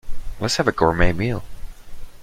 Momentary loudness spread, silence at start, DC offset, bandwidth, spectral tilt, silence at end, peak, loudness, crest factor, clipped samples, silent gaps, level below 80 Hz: 12 LU; 0.05 s; under 0.1%; 14.5 kHz; -5 dB/octave; 0 s; -2 dBFS; -21 LUFS; 18 dB; under 0.1%; none; -30 dBFS